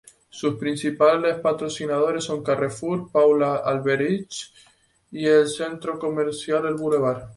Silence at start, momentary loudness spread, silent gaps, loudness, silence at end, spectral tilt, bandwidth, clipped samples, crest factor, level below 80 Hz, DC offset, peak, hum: 0.35 s; 10 LU; none; -22 LUFS; 0.05 s; -5.5 dB/octave; 11.5 kHz; under 0.1%; 18 dB; -62 dBFS; under 0.1%; -6 dBFS; none